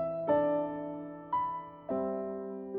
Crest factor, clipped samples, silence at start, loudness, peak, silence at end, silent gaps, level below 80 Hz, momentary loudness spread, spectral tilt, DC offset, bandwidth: 16 dB; under 0.1%; 0 s; -34 LUFS; -18 dBFS; 0 s; none; -66 dBFS; 12 LU; -10.5 dB/octave; under 0.1%; 3.8 kHz